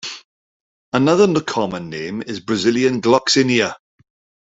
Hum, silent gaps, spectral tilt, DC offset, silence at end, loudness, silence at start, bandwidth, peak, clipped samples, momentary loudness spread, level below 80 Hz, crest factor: none; 0.25-0.92 s; -4.5 dB/octave; under 0.1%; 0.7 s; -17 LUFS; 0.05 s; 8 kHz; -2 dBFS; under 0.1%; 13 LU; -58 dBFS; 18 dB